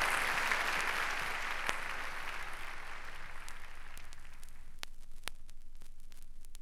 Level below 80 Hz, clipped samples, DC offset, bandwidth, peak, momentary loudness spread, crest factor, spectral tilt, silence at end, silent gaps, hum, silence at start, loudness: -46 dBFS; under 0.1%; under 0.1%; 15.5 kHz; -12 dBFS; 26 LU; 26 dB; -1 dB/octave; 0 s; none; none; 0 s; -37 LUFS